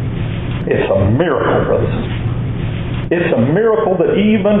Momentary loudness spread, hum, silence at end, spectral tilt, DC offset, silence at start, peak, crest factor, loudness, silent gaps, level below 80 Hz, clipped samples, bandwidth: 8 LU; none; 0 s; -12 dB/octave; under 0.1%; 0 s; -2 dBFS; 12 dB; -15 LUFS; none; -30 dBFS; under 0.1%; 4 kHz